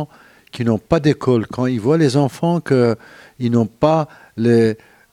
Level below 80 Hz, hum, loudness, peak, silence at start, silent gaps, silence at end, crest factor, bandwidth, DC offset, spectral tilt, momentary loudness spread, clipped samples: -50 dBFS; none; -17 LUFS; 0 dBFS; 0 s; none; 0.35 s; 16 dB; 13 kHz; under 0.1%; -7.5 dB/octave; 11 LU; under 0.1%